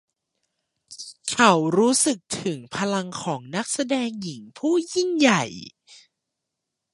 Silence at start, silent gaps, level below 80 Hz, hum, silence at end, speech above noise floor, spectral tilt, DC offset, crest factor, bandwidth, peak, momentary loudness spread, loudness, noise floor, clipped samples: 0.9 s; none; -68 dBFS; none; 1 s; 60 dB; -3.5 dB/octave; under 0.1%; 24 dB; 11.5 kHz; -2 dBFS; 16 LU; -22 LUFS; -82 dBFS; under 0.1%